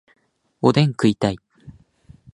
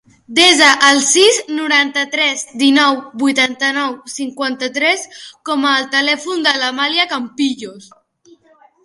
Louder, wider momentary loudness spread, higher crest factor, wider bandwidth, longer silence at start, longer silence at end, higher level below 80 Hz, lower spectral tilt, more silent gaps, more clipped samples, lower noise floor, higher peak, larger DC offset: second, -19 LUFS vs -13 LUFS; second, 7 LU vs 12 LU; about the same, 20 dB vs 16 dB; about the same, 11.5 kHz vs 11.5 kHz; first, 0.65 s vs 0.3 s; second, 0.65 s vs 1.05 s; first, -52 dBFS vs -64 dBFS; first, -7 dB/octave vs 0 dB/octave; neither; neither; about the same, -51 dBFS vs -50 dBFS; about the same, -2 dBFS vs 0 dBFS; neither